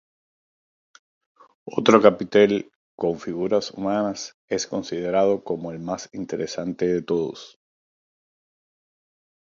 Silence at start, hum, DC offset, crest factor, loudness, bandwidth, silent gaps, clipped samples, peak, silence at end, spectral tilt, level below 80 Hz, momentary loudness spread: 1.65 s; none; under 0.1%; 24 dB; -23 LUFS; 7.4 kHz; 2.76-2.98 s, 4.34-4.48 s; under 0.1%; 0 dBFS; 2.05 s; -5 dB/octave; -62 dBFS; 14 LU